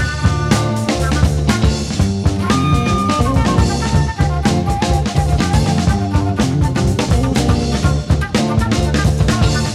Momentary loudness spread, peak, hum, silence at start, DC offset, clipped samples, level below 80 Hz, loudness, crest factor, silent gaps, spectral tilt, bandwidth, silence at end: 2 LU; 0 dBFS; none; 0 s; under 0.1%; under 0.1%; -22 dBFS; -15 LUFS; 14 dB; none; -6 dB/octave; 14 kHz; 0 s